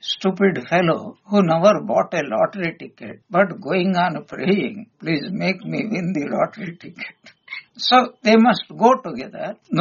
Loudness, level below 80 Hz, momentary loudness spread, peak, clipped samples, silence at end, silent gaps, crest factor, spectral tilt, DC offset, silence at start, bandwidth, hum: -19 LUFS; -64 dBFS; 18 LU; -2 dBFS; under 0.1%; 0 s; none; 18 dB; -4 dB/octave; under 0.1%; 0.05 s; 7.2 kHz; none